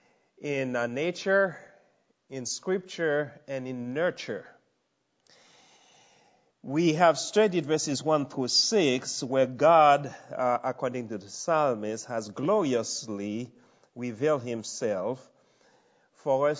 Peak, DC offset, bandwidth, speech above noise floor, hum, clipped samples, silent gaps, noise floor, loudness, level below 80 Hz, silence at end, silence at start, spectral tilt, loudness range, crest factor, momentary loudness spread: -6 dBFS; under 0.1%; 8 kHz; 48 dB; none; under 0.1%; none; -75 dBFS; -27 LUFS; -78 dBFS; 0 s; 0.4 s; -4 dB/octave; 9 LU; 22 dB; 15 LU